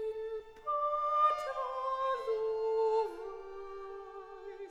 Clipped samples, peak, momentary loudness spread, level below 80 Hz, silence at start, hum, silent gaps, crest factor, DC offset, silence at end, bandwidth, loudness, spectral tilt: under 0.1%; -18 dBFS; 17 LU; -64 dBFS; 0 s; none; none; 16 dB; under 0.1%; 0 s; 9.6 kHz; -34 LUFS; -3.5 dB/octave